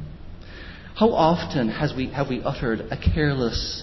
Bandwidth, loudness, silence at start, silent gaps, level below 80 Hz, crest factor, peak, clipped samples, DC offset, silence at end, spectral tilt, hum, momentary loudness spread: 6.2 kHz; -23 LUFS; 0 s; none; -34 dBFS; 18 dB; -6 dBFS; under 0.1%; under 0.1%; 0 s; -6.5 dB/octave; none; 20 LU